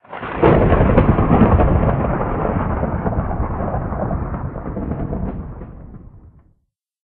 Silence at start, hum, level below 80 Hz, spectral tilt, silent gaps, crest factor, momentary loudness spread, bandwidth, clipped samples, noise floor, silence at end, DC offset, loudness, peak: 0.1 s; none; -24 dBFS; -8.5 dB/octave; none; 18 dB; 14 LU; 4 kHz; under 0.1%; -67 dBFS; 0.85 s; under 0.1%; -18 LUFS; 0 dBFS